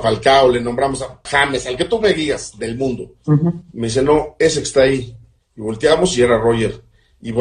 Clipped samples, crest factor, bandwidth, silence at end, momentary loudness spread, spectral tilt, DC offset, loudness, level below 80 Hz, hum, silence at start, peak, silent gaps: under 0.1%; 16 dB; 10.5 kHz; 0 s; 13 LU; -5 dB/octave; under 0.1%; -16 LUFS; -40 dBFS; none; 0 s; 0 dBFS; none